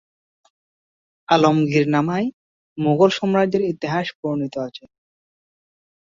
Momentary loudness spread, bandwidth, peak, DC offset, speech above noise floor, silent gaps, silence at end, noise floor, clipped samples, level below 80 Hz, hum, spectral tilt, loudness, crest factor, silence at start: 11 LU; 7.6 kHz; -2 dBFS; under 0.1%; over 71 dB; 2.33-2.76 s, 4.15-4.23 s; 1.25 s; under -90 dBFS; under 0.1%; -62 dBFS; none; -6.5 dB/octave; -20 LUFS; 20 dB; 1.3 s